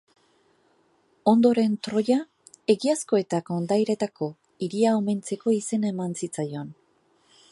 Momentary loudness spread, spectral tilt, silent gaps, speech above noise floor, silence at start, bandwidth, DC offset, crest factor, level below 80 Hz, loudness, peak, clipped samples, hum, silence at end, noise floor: 12 LU; -6 dB/octave; none; 41 dB; 1.25 s; 11.5 kHz; under 0.1%; 18 dB; -74 dBFS; -25 LUFS; -6 dBFS; under 0.1%; none; 0.8 s; -65 dBFS